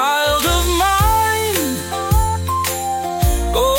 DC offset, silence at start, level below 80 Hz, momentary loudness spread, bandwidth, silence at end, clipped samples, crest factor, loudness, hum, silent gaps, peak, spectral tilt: under 0.1%; 0 s; -24 dBFS; 6 LU; 17 kHz; 0 s; under 0.1%; 12 dB; -17 LUFS; none; none; -4 dBFS; -3.5 dB/octave